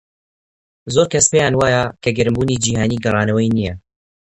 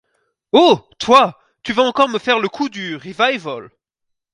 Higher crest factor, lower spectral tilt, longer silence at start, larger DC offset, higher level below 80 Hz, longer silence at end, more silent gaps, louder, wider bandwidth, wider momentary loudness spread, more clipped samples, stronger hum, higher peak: about the same, 18 dB vs 18 dB; about the same, -4.5 dB/octave vs -4 dB/octave; first, 0.85 s vs 0.55 s; neither; first, -42 dBFS vs -58 dBFS; about the same, 0.55 s vs 0.65 s; neither; about the same, -16 LUFS vs -15 LUFS; about the same, 11 kHz vs 11 kHz; second, 7 LU vs 15 LU; neither; neither; about the same, 0 dBFS vs 0 dBFS